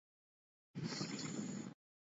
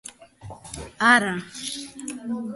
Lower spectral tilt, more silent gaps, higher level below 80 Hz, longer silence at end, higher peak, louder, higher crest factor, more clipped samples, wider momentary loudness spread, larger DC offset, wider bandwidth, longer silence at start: first, -4.5 dB/octave vs -3 dB/octave; neither; second, -84 dBFS vs -54 dBFS; first, 0.45 s vs 0 s; second, -30 dBFS vs -4 dBFS; second, -46 LUFS vs -22 LUFS; about the same, 18 dB vs 22 dB; neither; second, 10 LU vs 25 LU; neither; second, 7.6 kHz vs 12 kHz; first, 0.75 s vs 0.05 s